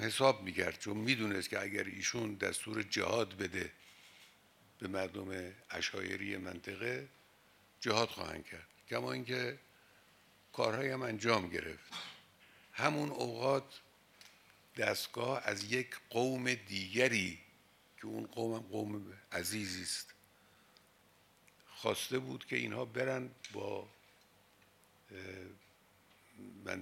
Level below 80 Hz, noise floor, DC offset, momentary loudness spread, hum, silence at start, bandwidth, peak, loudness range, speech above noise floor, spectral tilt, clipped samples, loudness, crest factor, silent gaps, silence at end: -74 dBFS; -68 dBFS; under 0.1%; 18 LU; none; 0 s; 16.5 kHz; -14 dBFS; 6 LU; 30 dB; -3.5 dB/octave; under 0.1%; -38 LUFS; 26 dB; none; 0 s